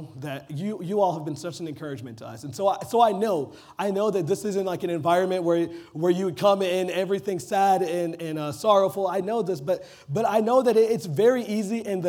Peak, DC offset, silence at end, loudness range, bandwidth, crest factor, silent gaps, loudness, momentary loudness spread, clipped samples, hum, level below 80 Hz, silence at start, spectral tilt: -6 dBFS; under 0.1%; 0 s; 3 LU; 18.5 kHz; 18 dB; none; -24 LUFS; 13 LU; under 0.1%; none; -70 dBFS; 0 s; -6 dB/octave